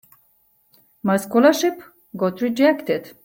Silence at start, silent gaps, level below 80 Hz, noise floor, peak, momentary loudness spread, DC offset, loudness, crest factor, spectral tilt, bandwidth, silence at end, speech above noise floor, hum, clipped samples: 1.05 s; none; -66 dBFS; -61 dBFS; -4 dBFS; 12 LU; under 0.1%; -20 LUFS; 18 dB; -5 dB/octave; 17 kHz; 0.15 s; 42 dB; none; under 0.1%